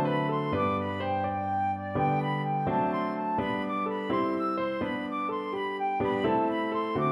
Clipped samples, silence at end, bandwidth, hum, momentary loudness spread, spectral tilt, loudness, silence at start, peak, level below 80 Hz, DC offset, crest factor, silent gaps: under 0.1%; 0 s; 11.5 kHz; none; 4 LU; -8.5 dB/octave; -29 LUFS; 0 s; -16 dBFS; -60 dBFS; under 0.1%; 14 dB; none